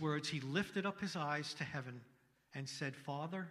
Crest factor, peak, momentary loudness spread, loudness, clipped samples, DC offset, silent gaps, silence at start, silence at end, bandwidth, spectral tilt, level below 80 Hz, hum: 20 dB; -22 dBFS; 10 LU; -42 LUFS; under 0.1%; under 0.1%; none; 0 s; 0 s; 14 kHz; -5 dB/octave; -78 dBFS; none